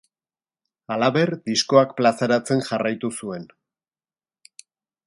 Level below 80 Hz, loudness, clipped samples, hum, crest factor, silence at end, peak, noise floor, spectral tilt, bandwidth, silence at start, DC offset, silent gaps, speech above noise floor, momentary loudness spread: -68 dBFS; -21 LUFS; under 0.1%; none; 22 dB; 1.6 s; -2 dBFS; under -90 dBFS; -5 dB/octave; 11.5 kHz; 0.9 s; under 0.1%; none; over 69 dB; 13 LU